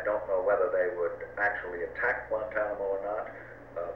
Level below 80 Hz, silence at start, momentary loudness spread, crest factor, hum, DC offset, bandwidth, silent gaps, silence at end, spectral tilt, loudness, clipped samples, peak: -58 dBFS; 0 s; 11 LU; 16 dB; none; under 0.1%; 5.8 kHz; none; 0 s; -7 dB/octave; -31 LUFS; under 0.1%; -16 dBFS